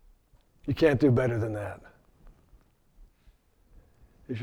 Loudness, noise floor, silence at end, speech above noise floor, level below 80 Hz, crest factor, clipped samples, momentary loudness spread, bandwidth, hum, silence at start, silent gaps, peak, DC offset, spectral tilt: -27 LUFS; -63 dBFS; 0 s; 37 dB; -52 dBFS; 22 dB; under 0.1%; 18 LU; 12 kHz; none; 0.65 s; none; -10 dBFS; under 0.1%; -8 dB/octave